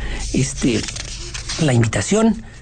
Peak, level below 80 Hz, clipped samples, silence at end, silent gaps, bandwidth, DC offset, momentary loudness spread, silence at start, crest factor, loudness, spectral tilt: -6 dBFS; -32 dBFS; under 0.1%; 0 s; none; 9.4 kHz; under 0.1%; 11 LU; 0 s; 14 dB; -19 LUFS; -5 dB/octave